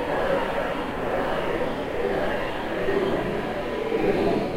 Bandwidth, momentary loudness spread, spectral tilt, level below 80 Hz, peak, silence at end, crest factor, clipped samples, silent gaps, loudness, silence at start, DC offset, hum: 16 kHz; 5 LU; -6.5 dB/octave; -40 dBFS; -10 dBFS; 0 s; 14 dB; under 0.1%; none; -26 LUFS; 0 s; under 0.1%; none